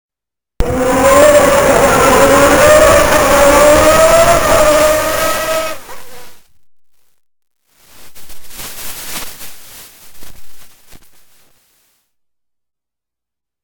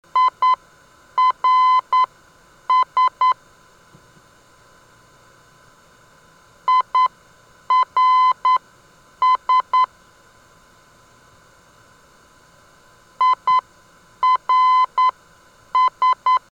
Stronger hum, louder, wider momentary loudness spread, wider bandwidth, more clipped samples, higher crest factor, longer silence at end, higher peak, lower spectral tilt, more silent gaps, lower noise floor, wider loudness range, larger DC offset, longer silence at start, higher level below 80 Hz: neither; first, -8 LUFS vs -18 LUFS; first, 18 LU vs 7 LU; first, 20 kHz vs 7.8 kHz; first, 0.3% vs under 0.1%; about the same, 12 dB vs 10 dB; first, 2.65 s vs 0.15 s; first, 0 dBFS vs -10 dBFS; first, -3.5 dB/octave vs -1 dB/octave; neither; first, -87 dBFS vs -51 dBFS; first, 22 LU vs 8 LU; neither; first, 0.6 s vs 0.15 s; first, -28 dBFS vs -64 dBFS